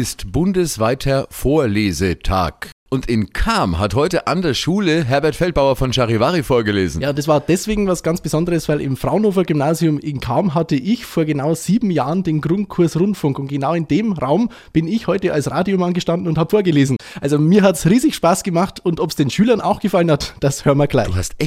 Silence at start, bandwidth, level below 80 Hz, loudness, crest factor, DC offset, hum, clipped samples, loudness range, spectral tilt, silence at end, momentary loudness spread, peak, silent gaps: 0 s; 16 kHz; -34 dBFS; -17 LUFS; 16 dB; under 0.1%; none; under 0.1%; 3 LU; -6 dB/octave; 0 s; 5 LU; -2 dBFS; 2.72-2.86 s